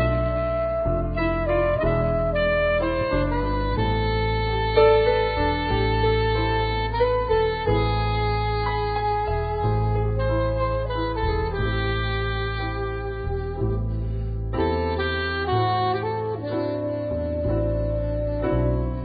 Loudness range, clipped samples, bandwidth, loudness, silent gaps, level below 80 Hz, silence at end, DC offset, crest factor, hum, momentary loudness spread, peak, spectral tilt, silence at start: 5 LU; under 0.1%; 5 kHz; -24 LUFS; none; -30 dBFS; 0 s; under 0.1%; 18 dB; none; 6 LU; -6 dBFS; -11.5 dB/octave; 0 s